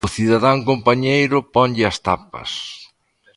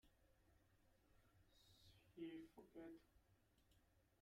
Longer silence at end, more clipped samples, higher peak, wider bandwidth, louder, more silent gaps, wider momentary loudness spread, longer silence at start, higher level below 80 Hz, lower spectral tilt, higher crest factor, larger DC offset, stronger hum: first, 0.55 s vs 0 s; neither; first, 0 dBFS vs -44 dBFS; second, 11.5 kHz vs 15.5 kHz; first, -17 LUFS vs -60 LUFS; neither; about the same, 12 LU vs 11 LU; about the same, 0.05 s vs 0.05 s; first, -44 dBFS vs -82 dBFS; about the same, -5.5 dB/octave vs -6 dB/octave; about the same, 18 dB vs 20 dB; neither; neither